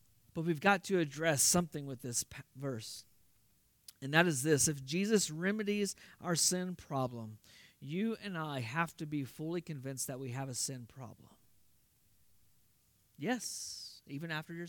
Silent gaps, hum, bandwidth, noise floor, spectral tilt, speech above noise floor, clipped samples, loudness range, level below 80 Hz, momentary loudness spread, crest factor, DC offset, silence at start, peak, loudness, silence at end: none; none; 18 kHz; -72 dBFS; -3.5 dB/octave; 36 dB; under 0.1%; 11 LU; -70 dBFS; 17 LU; 24 dB; under 0.1%; 0.35 s; -14 dBFS; -35 LUFS; 0 s